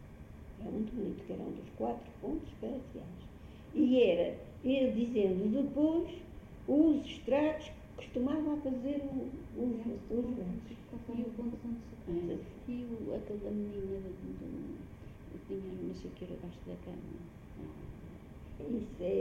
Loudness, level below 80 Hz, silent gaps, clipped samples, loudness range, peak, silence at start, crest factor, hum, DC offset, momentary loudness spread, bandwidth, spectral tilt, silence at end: -36 LUFS; -54 dBFS; none; under 0.1%; 13 LU; -16 dBFS; 0 s; 20 dB; none; under 0.1%; 18 LU; 7.6 kHz; -8 dB/octave; 0 s